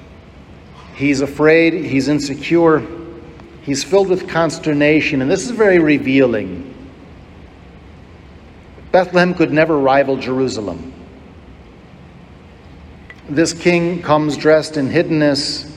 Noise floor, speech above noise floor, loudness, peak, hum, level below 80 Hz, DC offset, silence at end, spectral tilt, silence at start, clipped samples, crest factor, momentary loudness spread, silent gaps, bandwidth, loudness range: -40 dBFS; 25 dB; -15 LUFS; 0 dBFS; none; -46 dBFS; under 0.1%; 0 s; -5.5 dB/octave; 0 s; under 0.1%; 16 dB; 15 LU; none; 12.5 kHz; 6 LU